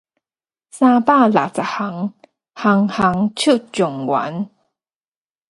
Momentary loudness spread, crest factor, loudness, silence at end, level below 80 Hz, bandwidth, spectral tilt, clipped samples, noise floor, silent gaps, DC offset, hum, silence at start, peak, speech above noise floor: 13 LU; 18 dB; -17 LUFS; 1 s; -58 dBFS; 11.5 kHz; -5.5 dB/octave; under 0.1%; under -90 dBFS; none; under 0.1%; none; 0.75 s; 0 dBFS; over 74 dB